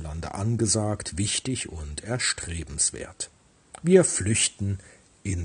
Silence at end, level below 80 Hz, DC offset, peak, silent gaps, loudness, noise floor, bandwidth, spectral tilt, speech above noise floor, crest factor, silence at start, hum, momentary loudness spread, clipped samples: 0 s; -48 dBFS; under 0.1%; -4 dBFS; none; -25 LUFS; -50 dBFS; 10.5 kHz; -4 dB/octave; 25 dB; 22 dB; 0 s; none; 16 LU; under 0.1%